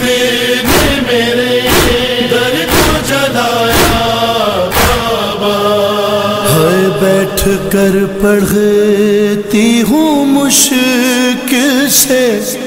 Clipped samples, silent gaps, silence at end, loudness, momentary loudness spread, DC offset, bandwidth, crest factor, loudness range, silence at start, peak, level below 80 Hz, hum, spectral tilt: under 0.1%; none; 0 s; -10 LUFS; 4 LU; 0.2%; 16.5 kHz; 10 dB; 2 LU; 0 s; 0 dBFS; -28 dBFS; none; -3.5 dB/octave